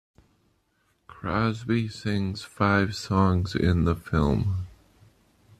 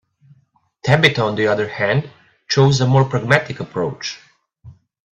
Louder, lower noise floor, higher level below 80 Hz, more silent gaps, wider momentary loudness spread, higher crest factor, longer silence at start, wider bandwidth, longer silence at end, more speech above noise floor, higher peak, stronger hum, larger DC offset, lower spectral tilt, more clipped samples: second, -26 LUFS vs -17 LUFS; first, -70 dBFS vs -59 dBFS; first, -44 dBFS vs -52 dBFS; neither; second, 8 LU vs 14 LU; about the same, 18 dB vs 18 dB; first, 1.1 s vs 0.85 s; first, 13 kHz vs 8.4 kHz; first, 0.9 s vs 0.45 s; about the same, 45 dB vs 43 dB; second, -8 dBFS vs 0 dBFS; neither; neither; first, -7 dB/octave vs -5.5 dB/octave; neither